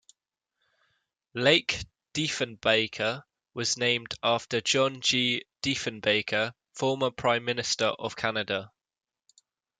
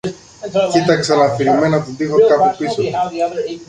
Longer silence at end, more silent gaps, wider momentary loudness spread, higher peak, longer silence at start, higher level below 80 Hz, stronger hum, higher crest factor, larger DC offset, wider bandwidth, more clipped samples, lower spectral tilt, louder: first, 1.15 s vs 0.05 s; neither; about the same, 8 LU vs 8 LU; second, -6 dBFS vs -2 dBFS; first, 1.35 s vs 0.05 s; second, -64 dBFS vs -52 dBFS; neither; first, 22 dB vs 14 dB; neither; about the same, 9.6 kHz vs 10 kHz; neither; second, -3 dB/octave vs -5.5 dB/octave; second, -27 LUFS vs -15 LUFS